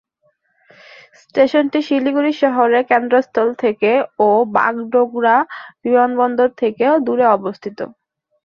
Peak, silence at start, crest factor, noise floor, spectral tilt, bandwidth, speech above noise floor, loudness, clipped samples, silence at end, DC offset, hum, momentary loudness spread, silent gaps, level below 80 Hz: -2 dBFS; 1.35 s; 16 dB; -63 dBFS; -6.5 dB/octave; 6.8 kHz; 48 dB; -16 LUFS; under 0.1%; 0.6 s; under 0.1%; none; 10 LU; none; -64 dBFS